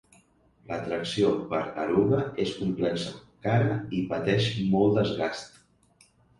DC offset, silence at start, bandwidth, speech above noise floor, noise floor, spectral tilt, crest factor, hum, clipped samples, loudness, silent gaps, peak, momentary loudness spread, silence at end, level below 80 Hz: under 0.1%; 0.7 s; 11.5 kHz; 36 dB; -62 dBFS; -6.5 dB/octave; 18 dB; none; under 0.1%; -27 LUFS; none; -10 dBFS; 11 LU; 0.9 s; -56 dBFS